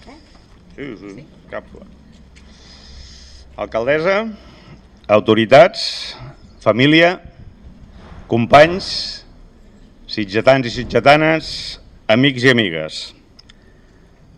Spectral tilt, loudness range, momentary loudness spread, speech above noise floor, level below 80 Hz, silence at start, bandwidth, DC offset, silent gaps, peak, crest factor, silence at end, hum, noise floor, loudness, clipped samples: -5.5 dB/octave; 10 LU; 22 LU; 32 dB; -44 dBFS; 0.05 s; 11.5 kHz; under 0.1%; none; 0 dBFS; 18 dB; 1.25 s; none; -47 dBFS; -14 LUFS; under 0.1%